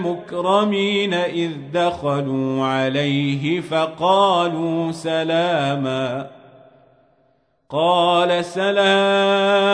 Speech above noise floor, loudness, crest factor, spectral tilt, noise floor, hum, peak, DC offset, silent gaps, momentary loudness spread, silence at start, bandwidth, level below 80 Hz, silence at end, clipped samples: 43 dB; -19 LUFS; 14 dB; -5.5 dB/octave; -62 dBFS; none; -4 dBFS; under 0.1%; none; 8 LU; 0 s; 10.5 kHz; -62 dBFS; 0 s; under 0.1%